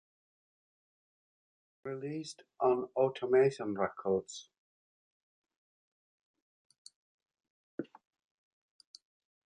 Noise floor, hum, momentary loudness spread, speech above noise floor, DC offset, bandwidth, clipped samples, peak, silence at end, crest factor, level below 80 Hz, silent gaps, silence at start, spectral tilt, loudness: under -90 dBFS; none; 19 LU; over 57 dB; under 0.1%; 9.6 kHz; under 0.1%; -18 dBFS; 1.6 s; 20 dB; -76 dBFS; 4.58-5.44 s, 5.56-6.34 s, 6.42-6.70 s, 6.78-6.85 s, 6.96-7.19 s, 7.50-7.78 s; 1.85 s; -6 dB/octave; -33 LUFS